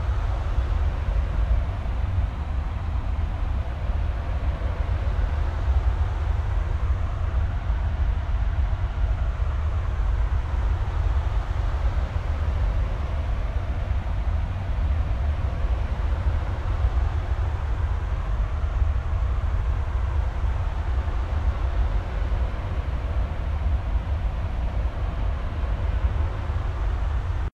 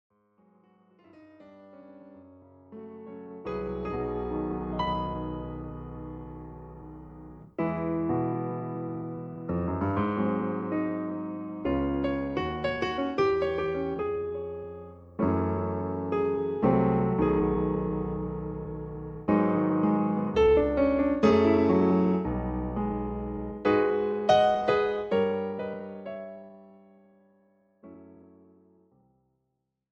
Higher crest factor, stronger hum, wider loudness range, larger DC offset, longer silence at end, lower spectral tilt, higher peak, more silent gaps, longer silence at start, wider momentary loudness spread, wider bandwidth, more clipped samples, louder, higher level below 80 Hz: second, 14 dB vs 20 dB; neither; second, 1 LU vs 11 LU; neither; second, 0.05 s vs 1.8 s; about the same, -7.5 dB/octave vs -8.5 dB/octave; about the same, -10 dBFS vs -8 dBFS; neither; second, 0 s vs 1.15 s; second, 3 LU vs 18 LU; about the same, 6.8 kHz vs 7.2 kHz; neither; about the same, -27 LUFS vs -28 LUFS; first, -26 dBFS vs -46 dBFS